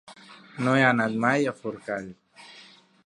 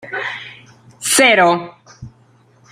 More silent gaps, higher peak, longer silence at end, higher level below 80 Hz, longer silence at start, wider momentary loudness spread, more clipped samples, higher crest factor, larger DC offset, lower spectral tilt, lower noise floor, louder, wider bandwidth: neither; second, -6 dBFS vs -2 dBFS; second, 0.45 s vs 0.65 s; second, -70 dBFS vs -58 dBFS; about the same, 0.1 s vs 0.05 s; about the same, 24 LU vs 23 LU; neither; first, 22 dB vs 16 dB; neither; first, -6 dB/octave vs -2 dB/octave; about the same, -53 dBFS vs -51 dBFS; second, -25 LUFS vs -14 LUFS; second, 11.5 kHz vs 16 kHz